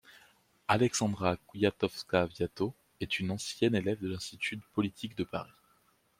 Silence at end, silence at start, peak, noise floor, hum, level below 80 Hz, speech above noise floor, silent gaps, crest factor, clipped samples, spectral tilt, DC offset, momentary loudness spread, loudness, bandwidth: 0.75 s; 0.1 s; -10 dBFS; -70 dBFS; none; -64 dBFS; 37 dB; none; 24 dB; under 0.1%; -5 dB/octave; under 0.1%; 9 LU; -33 LUFS; 16 kHz